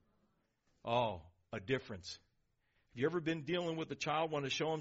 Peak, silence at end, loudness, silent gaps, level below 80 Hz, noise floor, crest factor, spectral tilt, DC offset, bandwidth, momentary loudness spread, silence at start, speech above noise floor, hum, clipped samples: -20 dBFS; 0 s; -39 LUFS; none; -70 dBFS; -79 dBFS; 20 dB; -4 dB/octave; under 0.1%; 7.6 kHz; 14 LU; 0.85 s; 41 dB; none; under 0.1%